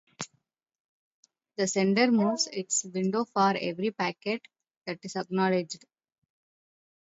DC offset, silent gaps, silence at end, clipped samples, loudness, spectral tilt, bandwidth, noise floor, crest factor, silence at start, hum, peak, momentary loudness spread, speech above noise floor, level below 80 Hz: under 0.1%; 0.80-1.23 s, 4.77-4.81 s; 1.4 s; under 0.1%; -28 LUFS; -4 dB/octave; 8 kHz; -75 dBFS; 20 dB; 0.2 s; none; -10 dBFS; 17 LU; 47 dB; -78 dBFS